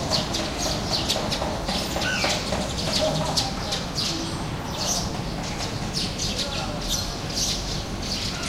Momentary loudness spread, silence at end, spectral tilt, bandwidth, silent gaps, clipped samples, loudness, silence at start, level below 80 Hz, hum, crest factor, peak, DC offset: 6 LU; 0 s; -3 dB/octave; 16.5 kHz; none; under 0.1%; -25 LUFS; 0 s; -38 dBFS; none; 20 dB; -6 dBFS; under 0.1%